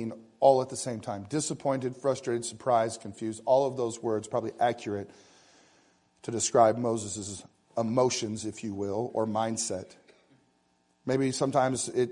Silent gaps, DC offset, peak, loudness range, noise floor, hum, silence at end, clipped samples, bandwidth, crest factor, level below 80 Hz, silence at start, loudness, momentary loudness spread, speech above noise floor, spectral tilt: none; under 0.1%; -8 dBFS; 3 LU; -70 dBFS; none; 0 s; under 0.1%; 11 kHz; 22 dB; -72 dBFS; 0 s; -29 LUFS; 13 LU; 41 dB; -4.5 dB/octave